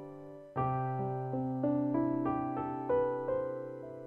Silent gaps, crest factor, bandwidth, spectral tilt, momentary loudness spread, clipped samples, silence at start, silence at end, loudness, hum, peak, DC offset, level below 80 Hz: none; 14 dB; 3.4 kHz; -11 dB/octave; 10 LU; under 0.1%; 0 s; 0 s; -34 LUFS; none; -20 dBFS; under 0.1%; -64 dBFS